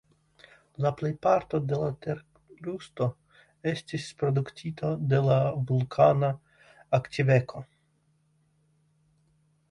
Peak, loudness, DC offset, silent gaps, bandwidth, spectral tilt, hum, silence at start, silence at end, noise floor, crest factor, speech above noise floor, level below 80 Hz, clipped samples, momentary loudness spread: -8 dBFS; -28 LUFS; under 0.1%; none; 11 kHz; -7.5 dB/octave; none; 0.8 s; 2.05 s; -69 dBFS; 22 dB; 43 dB; -62 dBFS; under 0.1%; 15 LU